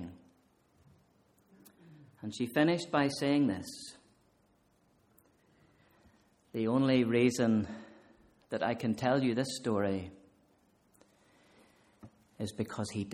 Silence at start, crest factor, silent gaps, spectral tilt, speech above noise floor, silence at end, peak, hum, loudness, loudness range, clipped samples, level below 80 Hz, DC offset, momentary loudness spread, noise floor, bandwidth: 0 s; 20 dB; none; -6 dB/octave; 39 dB; 0 s; -14 dBFS; none; -32 LUFS; 9 LU; under 0.1%; -70 dBFS; under 0.1%; 17 LU; -70 dBFS; 16 kHz